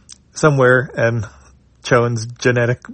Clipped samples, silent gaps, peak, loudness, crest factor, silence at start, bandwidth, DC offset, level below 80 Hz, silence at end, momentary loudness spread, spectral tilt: under 0.1%; none; 0 dBFS; -16 LUFS; 16 dB; 0.35 s; 8.8 kHz; under 0.1%; -50 dBFS; 0 s; 16 LU; -6 dB/octave